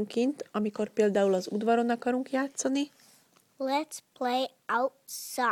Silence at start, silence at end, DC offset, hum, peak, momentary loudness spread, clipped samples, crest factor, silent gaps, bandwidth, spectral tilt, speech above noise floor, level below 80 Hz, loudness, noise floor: 0 s; 0 s; under 0.1%; none; -14 dBFS; 9 LU; under 0.1%; 16 dB; none; 19 kHz; -4 dB/octave; 34 dB; -78 dBFS; -30 LUFS; -63 dBFS